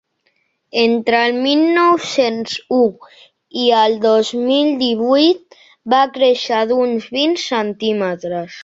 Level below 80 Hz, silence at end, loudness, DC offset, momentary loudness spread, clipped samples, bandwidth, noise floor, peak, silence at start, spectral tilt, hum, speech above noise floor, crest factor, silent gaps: -64 dBFS; 0 s; -15 LUFS; under 0.1%; 8 LU; under 0.1%; 8 kHz; -64 dBFS; 0 dBFS; 0.75 s; -4 dB/octave; none; 49 dB; 16 dB; none